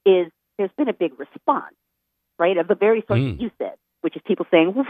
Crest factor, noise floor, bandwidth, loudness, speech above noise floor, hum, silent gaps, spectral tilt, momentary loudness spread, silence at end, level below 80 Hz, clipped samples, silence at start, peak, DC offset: 20 dB; -76 dBFS; 4.7 kHz; -22 LUFS; 56 dB; none; none; -9.5 dB/octave; 11 LU; 0 s; -52 dBFS; under 0.1%; 0.05 s; -2 dBFS; under 0.1%